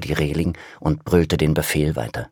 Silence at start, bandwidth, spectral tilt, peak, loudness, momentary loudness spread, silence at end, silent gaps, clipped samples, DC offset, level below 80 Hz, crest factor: 0 s; 19 kHz; -6 dB/octave; -2 dBFS; -21 LUFS; 8 LU; 0.05 s; none; under 0.1%; under 0.1%; -34 dBFS; 18 dB